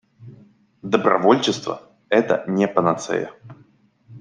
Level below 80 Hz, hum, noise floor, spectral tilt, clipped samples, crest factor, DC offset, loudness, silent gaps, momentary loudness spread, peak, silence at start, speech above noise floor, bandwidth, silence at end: -66 dBFS; none; -55 dBFS; -5 dB/octave; under 0.1%; 20 dB; under 0.1%; -20 LUFS; none; 15 LU; -2 dBFS; 0.2 s; 36 dB; 10 kHz; 0 s